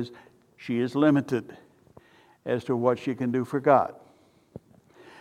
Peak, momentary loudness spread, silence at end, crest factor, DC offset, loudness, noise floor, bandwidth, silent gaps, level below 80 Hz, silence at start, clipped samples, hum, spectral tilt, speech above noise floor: -6 dBFS; 16 LU; 1.3 s; 22 dB; under 0.1%; -26 LUFS; -59 dBFS; 12.5 kHz; none; -70 dBFS; 0 s; under 0.1%; none; -8 dB/octave; 34 dB